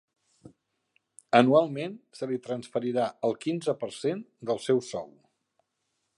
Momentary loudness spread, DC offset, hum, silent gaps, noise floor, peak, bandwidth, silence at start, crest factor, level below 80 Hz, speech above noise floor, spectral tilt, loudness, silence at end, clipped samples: 15 LU; under 0.1%; none; none; -79 dBFS; -4 dBFS; 11.5 kHz; 0.45 s; 26 dB; -76 dBFS; 52 dB; -6 dB/octave; -28 LUFS; 1.1 s; under 0.1%